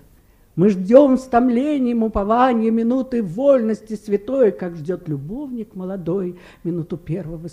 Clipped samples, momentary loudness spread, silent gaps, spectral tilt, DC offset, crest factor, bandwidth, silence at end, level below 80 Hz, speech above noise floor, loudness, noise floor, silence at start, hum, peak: under 0.1%; 15 LU; none; -8.5 dB/octave; under 0.1%; 18 dB; 10.5 kHz; 0 s; -44 dBFS; 33 dB; -19 LUFS; -52 dBFS; 0.55 s; none; 0 dBFS